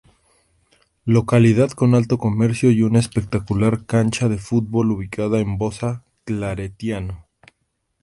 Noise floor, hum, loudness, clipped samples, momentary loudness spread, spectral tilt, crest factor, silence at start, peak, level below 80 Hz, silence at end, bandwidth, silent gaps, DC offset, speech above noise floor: -71 dBFS; none; -19 LUFS; under 0.1%; 12 LU; -7.5 dB/octave; 18 dB; 1.05 s; -2 dBFS; -44 dBFS; 0.8 s; 11.5 kHz; none; under 0.1%; 53 dB